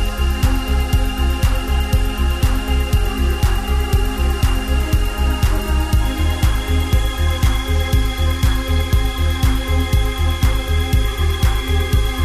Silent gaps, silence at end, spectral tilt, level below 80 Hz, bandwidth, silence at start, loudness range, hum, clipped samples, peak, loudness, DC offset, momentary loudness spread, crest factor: none; 0 s; -5.5 dB/octave; -18 dBFS; 16 kHz; 0 s; 1 LU; none; under 0.1%; -4 dBFS; -19 LUFS; under 0.1%; 2 LU; 12 dB